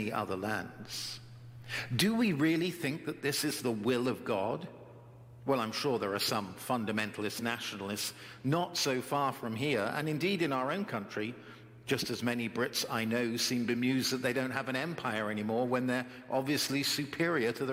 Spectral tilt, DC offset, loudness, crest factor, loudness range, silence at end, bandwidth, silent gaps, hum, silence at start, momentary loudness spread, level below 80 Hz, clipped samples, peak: -4 dB/octave; under 0.1%; -33 LUFS; 20 dB; 2 LU; 0 s; 16.5 kHz; none; none; 0 s; 9 LU; -72 dBFS; under 0.1%; -14 dBFS